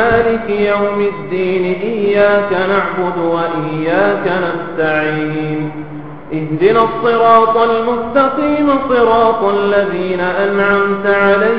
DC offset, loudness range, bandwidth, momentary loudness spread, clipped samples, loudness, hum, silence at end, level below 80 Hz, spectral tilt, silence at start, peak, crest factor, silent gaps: 2%; 4 LU; 5.4 kHz; 8 LU; under 0.1%; -13 LUFS; none; 0 s; -44 dBFS; -9 dB/octave; 0 s; 0 dBFS; 14 dB; none